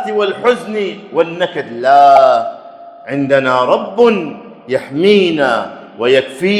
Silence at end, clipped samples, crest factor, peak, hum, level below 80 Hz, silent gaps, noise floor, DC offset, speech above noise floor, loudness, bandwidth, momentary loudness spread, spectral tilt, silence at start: 0 s; 0.2%; 12 dB; 0 dBFS; none; -62 dBFS; none; -34 dBFS; under 0.1%; 22 dB; -13 LUFS; 11.5 kHz; 14 LU; -5.5 dB/octave; 0 s